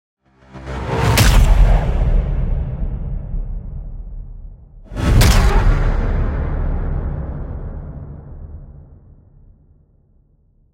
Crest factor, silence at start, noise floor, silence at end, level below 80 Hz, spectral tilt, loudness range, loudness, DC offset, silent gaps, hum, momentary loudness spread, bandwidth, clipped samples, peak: 16 dB; 0.55 s; -55 dBFS; 1.8 s; -18 dBFS; -5 dB/octave; 13 LU; -18 LUFS; under 0.1%; none; none; 22 LU; 16.5 kHz; under 0.1%; -2 dBFS